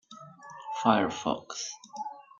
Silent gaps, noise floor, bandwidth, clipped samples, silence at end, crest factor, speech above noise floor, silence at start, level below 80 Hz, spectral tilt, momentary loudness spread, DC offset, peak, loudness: none; -49 dBFS; 7.6 kHz; under 0.1%; 0.15 s; 26 dB; 20 dB; 0.1 s; -72 dBFS; -4 dB/octave; 22 LU; under 0.1%; -6 dBFS; -30 LUFS